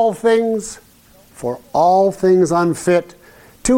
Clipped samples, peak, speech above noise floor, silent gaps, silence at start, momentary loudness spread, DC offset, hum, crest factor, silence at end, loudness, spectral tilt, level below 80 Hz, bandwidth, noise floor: under 0.1%; -4 dBFS; 33 dB; none; 0 s; 13 LU; under 0.1%; none; 12 dB; 0 s; -16 LUFS; -5.5 dB/octave; -44 dBFS; 16.5 kHz; -48 dBFS